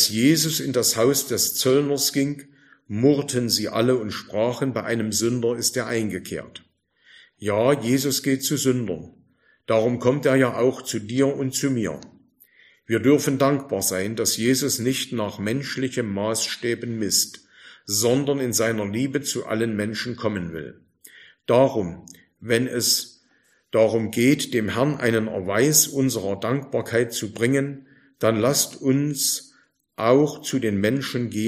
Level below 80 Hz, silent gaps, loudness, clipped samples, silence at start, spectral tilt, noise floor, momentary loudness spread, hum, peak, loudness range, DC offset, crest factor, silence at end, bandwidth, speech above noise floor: -62 dBFS; none; -22 LUFS; under 0.1%; 0 s; -4 dB/octave; -63 dBFS; 10 LU; none; -4 dBFS; 4 LU; under 0.1%; 20 dB; 0 s; 15.5 kHz; 41 dB